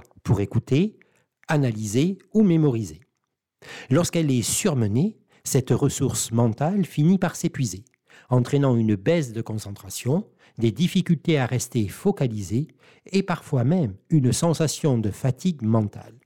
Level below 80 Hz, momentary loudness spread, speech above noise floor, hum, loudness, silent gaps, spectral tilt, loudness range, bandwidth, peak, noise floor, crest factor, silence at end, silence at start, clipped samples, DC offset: -54 dBFS; 9 LU; 57 dB; none; -23 LUFS; none; -6 dB/octave; 2 LU; 17.5 kHz; -10 dBFS; -79 dBFS; 14 dB; 0.15 s; 0.25 s; under 0.1%; under 0.1%